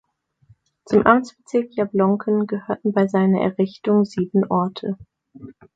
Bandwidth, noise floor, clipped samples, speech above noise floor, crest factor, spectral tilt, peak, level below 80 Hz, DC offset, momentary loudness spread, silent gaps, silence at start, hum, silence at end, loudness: 7.8 kHz; -57 dBFS; under 0.1%; 37 dB; 20 dB; -8 dB/octave; 0 dBFS; -58 dBFS; under 0.1%; 8 LU; none; 0.9 s; none; 0.25 s; -20 LUFS